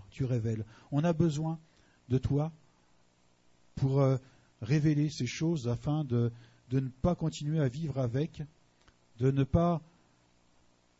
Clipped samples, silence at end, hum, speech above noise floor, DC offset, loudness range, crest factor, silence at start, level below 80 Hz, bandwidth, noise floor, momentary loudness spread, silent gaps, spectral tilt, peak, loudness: under 0.1%; 1.15 s; 60 Hz at -55 dBFS; 36 dB; under 0.1%; 3 LU; 20 dB; 0 s; -52 dBFS; 8 kHz; -67 dBFS; 9 LU; none; -7.5 dB/octave; -12 dBFS; -32 LUFS